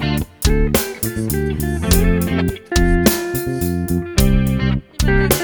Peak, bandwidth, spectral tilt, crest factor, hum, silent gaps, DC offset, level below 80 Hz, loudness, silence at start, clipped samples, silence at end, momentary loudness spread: 0 dBFS; over 20 kHz; -5 dB/octave; 16 dB; none; none; under 0.1%; -22 dBFS; -18 LUFS; 0 s; under 0.1%; 0 s; 6 LU